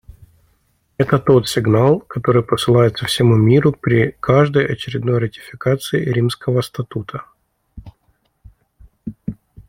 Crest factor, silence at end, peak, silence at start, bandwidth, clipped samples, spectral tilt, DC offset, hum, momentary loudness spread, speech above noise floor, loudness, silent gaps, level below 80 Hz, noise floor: 16 dB; 0.05 s; 0 dBFS; 1 s; 16 kHz; under 0.1%; -6.5 dB/octave; under 0.1%; none; 16 LU; 47 dB; -16 LUFS; none; -46 dBFS; -62 dBFS